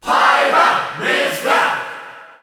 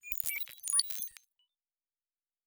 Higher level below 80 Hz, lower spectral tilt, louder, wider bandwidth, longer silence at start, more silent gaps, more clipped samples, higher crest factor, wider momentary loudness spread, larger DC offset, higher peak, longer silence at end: first, -60 dBFS vs -70 dBFS; first, -2 dB/octave vs 4 dB/octave; first, -15 LUFS vs -32 LUFS; about the same, over 20 kHz vs over 20 kHz; about the same, 0.05 s vs 0.05 s; neither; neither; second, 14 dB vs 32 dB; first, 12 LU vs 9 LU; neither; first, -2 dBFS vs -8 dBFS; second, 0.15 s vs 1.35 s